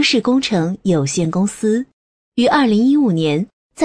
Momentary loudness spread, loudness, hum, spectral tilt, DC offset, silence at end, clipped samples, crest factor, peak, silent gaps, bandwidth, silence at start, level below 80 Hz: 9 LU; -16 LUFS; none; -5 dB/octave; 0.2%; 0 s; under 0.1%; 12 dB; -4 dBFS; 1.93-2.32 s, 3.53-3.70 s; 11 kHz; 0 s; -54 dBFS